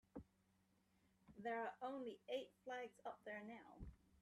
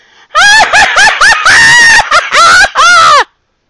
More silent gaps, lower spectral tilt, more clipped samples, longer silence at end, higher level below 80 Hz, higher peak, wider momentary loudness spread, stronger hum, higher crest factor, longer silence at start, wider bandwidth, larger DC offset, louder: neither; first, -5.5 dB/octave vs 0.5 dB/octave; second, under 0.1% vs 5%; second, 0.05 s vs 0.45 s; second, -72 dBFS vs -34 dBFS; second, -36 dBFS vs 0 dBFS; first, 14 LU vs 5 LU; neither; first, 18 dB vs 4 dB; second, 0.15 s vs 0.35 s; about the same, 13 kHz vs 12 kHz; neither; second, -52 LUFS vs -3 LUFS